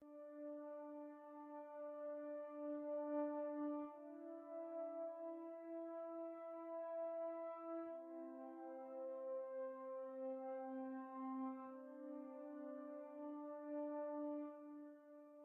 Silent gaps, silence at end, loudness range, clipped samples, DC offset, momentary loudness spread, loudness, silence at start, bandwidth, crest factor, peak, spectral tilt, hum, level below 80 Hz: none; 0 s; 3 LU; under 0.1%; under 0.1%; 8 LU; -50 LUFS; 0 s; 3.5 kHz; 16 dB; -32 dBFS; 0.5 dB/octave; none; under -90 dBFS